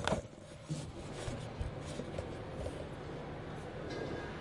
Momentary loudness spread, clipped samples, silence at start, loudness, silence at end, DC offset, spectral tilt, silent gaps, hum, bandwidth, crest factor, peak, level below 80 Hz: 4 LU; under 0.1%; 0 s; -43 LUFS; 0 s; under 0.1%; -5.5 dB/octave; none; none; 11.5 kHz; 28 dB; -12 dBFS; -52 dBFS